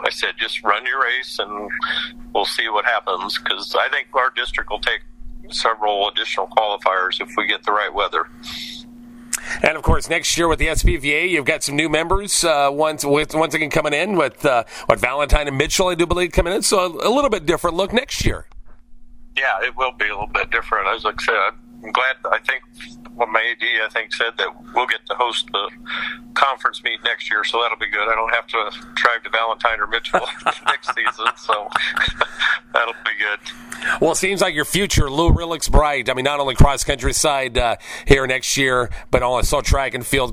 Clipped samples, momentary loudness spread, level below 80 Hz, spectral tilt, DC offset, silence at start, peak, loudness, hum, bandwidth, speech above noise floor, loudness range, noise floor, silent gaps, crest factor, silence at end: under 0.1%; 6 LU; -30 dBFS; -3 dB/octave; under 0.1%; 0 s; 0 dBFS; -19 LUFS; none; 16 kHz; 20 dB; 3 LU; -40 dBFS; none; 20 dB; 0 s